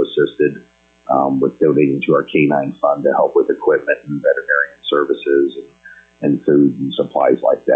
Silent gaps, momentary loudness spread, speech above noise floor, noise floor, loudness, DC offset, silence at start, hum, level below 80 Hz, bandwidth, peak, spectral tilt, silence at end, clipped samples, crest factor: none; 6 LU; 26 dB; -41 dBFS; -16 LUFS; under 0.1%; 0 s; none; -62 dBFS; 4 kHz; -2 dBFS; -8.5 dB/octave; 0 s; under 0.1%; 12 dB